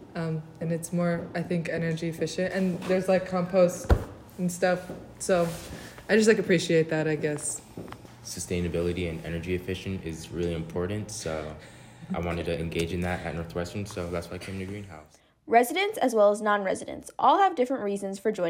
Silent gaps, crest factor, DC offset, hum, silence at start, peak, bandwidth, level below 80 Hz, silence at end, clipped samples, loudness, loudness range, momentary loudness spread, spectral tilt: none; 20 dB; under 0.1%; none; 0 s; -8 dBFS; 16 kHz; -44 dBFS; 0 s; under 0.1%; -28 LUFS; 7 LU; 15 LU; -5.5 dB/octave